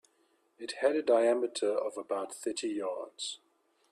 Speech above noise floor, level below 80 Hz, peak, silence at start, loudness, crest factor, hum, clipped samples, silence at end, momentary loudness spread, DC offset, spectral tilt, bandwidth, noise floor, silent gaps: 40 dB; -80 dBFS; -14 dBFS; 0.6 s; -32 LUFS; 20 dB; none; under 0.1%; 0.55 s; 13 LU; under 0.1%; -2.5 dB/octave; 13 kHz; -72 dBFS; none